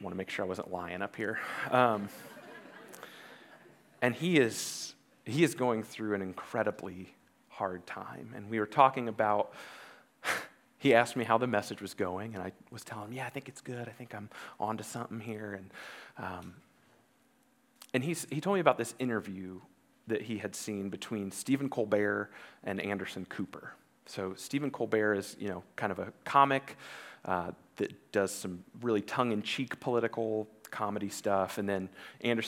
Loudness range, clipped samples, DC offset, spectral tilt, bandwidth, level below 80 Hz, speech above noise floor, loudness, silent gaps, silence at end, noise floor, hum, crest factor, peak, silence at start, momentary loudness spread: 9 LU; under 0.1%; under 0.1%; -5 dB/octave; 17.5 kHz; -82 dBFS; 35 dB; -33 LUFS; none; 0 s; -69 dBFS; none; 26 dB; -8 dBFS; 0 s; 19 LU